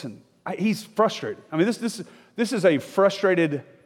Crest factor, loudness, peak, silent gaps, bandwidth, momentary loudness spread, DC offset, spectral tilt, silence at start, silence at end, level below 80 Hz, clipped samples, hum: 18 dB; -23 LUFS; -6 dBFS; none; 17 kHz; 16 LU; under 0.1%; -5.5 dB/octave; 0 s; 0.25 s; -76 dBFS; under 0.1%; none